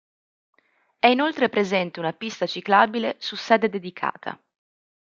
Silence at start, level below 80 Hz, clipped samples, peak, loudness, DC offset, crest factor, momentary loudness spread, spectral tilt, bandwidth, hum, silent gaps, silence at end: 1.05 s; -74 dBFS; under 0.1%; -2 dBFS; -22 LUFS; under 0.1%; 22 dB; 11 LU; -5 dB/octave; 7.6 kHz; none; none; 0.75 s